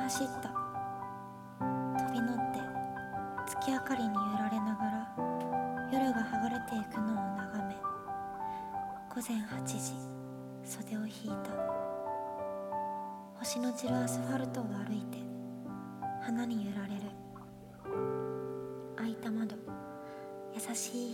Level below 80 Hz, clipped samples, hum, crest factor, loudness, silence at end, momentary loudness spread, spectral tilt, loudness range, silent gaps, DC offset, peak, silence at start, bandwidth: -68 dBFS; under 0.1%; none; 16 dB; -38 LUFS; 0 s; 11 LU; -5 dB/octave; 5 LU; none; under 0.1%; -20 dBFS; 0 s; 17.5 kHz